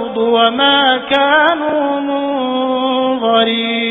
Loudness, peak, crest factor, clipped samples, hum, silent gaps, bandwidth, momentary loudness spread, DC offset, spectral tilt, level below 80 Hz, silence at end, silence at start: -13 LUFS; 0 dBFS; 14 dB; under 0.1%; none; none; 4 kHz; 7 LU; under 0.1%; -6 dB/octave; -56 dBFS; 0 s; 0 s